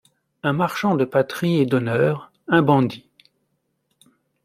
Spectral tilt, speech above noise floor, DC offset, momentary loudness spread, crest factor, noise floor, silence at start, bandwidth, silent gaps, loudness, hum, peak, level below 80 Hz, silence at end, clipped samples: -7 dB/octave; 53 dB; under 0.1%; 8 LU; 20 dB; -72 dBFS; 0.45 s; 15.5 kHz; none; -20 LUFS; none; -2 dBFS; -62 dBFS; 1.45 s; under 0.1%